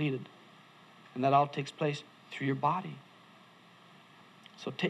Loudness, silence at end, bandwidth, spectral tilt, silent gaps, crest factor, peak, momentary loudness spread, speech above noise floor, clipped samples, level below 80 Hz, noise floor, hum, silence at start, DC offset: -33 LUFS; 0 s; 11.5 kHz; -6.5 dB/octave; none; 22 dB; -12 dBFS; 24 LU; 26 dB; under 0.1%; -84 dBFS; -58 dBFS; none; 0 s; under 0.1%